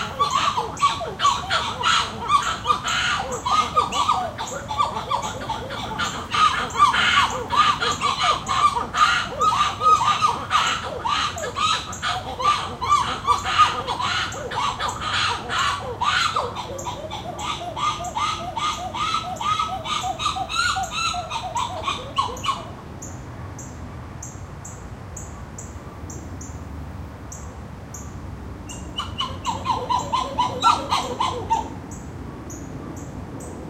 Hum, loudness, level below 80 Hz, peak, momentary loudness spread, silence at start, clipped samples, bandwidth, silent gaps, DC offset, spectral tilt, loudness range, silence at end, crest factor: none; -22 LUFS; -44 dBFS; -4 dBFS; 17 LU; 0 s; under 0.1%; 16 kHz; none; under 0.1%; -2.5 dB/octave; 16 LU; 0 s; 20 dB